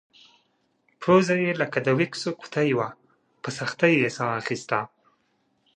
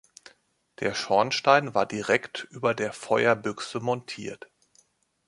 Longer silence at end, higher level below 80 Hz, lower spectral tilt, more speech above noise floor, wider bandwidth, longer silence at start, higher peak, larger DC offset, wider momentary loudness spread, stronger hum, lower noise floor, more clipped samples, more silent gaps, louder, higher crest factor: about the same, 0.9 s vs 0.9 s; about the same, -68 dBFS vs -68 dBFS; first, -5.5 dB/octave vs -4 dB/octave; first, 46 dB vs 40 dB; second, 9.8 kHz vs 11.5 kHz; first, 1 s vs 0.8 s; about the same, -4 dBFS vs -6 dBFS; neither; second, 12 LU vs 16 LU; neither; first, -70 dBFS vs -66 dBFS; neither; neither; about the same, -24 LUFS vs -26 LUFS; about the same, 22 dB vs 22 dB